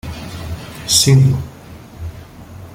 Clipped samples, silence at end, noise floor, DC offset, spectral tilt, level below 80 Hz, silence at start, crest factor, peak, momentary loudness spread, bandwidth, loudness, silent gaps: under 0.1%; 0 s; -36 dBFS; under 0.1%; -4 dB/octave; -38 dBFS; 0.05 s; 18 dB; 0 dBFS; 21 LU; 16.5 kHz; -12 LUFS; none